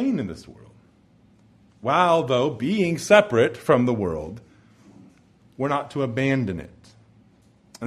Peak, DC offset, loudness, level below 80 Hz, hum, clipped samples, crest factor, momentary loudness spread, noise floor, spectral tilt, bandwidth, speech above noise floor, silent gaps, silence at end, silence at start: -2 dBFS; under 0.1%; -22 LUFS; -56 dBFS; none; under 0.1%; 22 dB; 16 LU; -57 dBFS; -6 dB/octave; 14 kHz; 35 dB; none; 0 s; 0 s